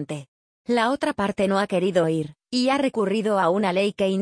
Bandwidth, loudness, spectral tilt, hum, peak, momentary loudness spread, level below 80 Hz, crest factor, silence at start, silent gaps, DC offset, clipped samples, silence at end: 10.5 kHz; -23 LUFS; -5.5 dB/octave; none; -8 dBFS; 7 LU; -60 dBFS; 16 dB; 0 s; 0.28-0.65 s; under 0.1%; under 0.1%; 0 s